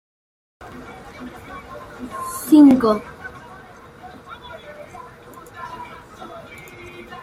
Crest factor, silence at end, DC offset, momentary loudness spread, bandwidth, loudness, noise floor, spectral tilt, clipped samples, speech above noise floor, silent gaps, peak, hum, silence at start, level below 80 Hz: 20 dB; 0 s; under 0.1%; 28 LU; 15.5 kHz; -15 LUFS; -42 dBFS; -5.5 dB/octave; under 0.1%; 26 dB; none; -2 dBFS; none; 0.75 s; -54 dBFS